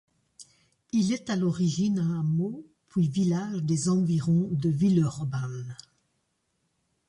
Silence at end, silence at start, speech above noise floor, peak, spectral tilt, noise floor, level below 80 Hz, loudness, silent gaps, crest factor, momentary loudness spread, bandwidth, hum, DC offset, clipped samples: 1.35 s; 0.4 s; 50 dB; -12 dBFS; -7 dB/octave; -75 dBFS; -62 dBFS; -27 LUFS; none; 14 dB; 10 LU; 11 kHz; none; under 0.1%; under 0.1%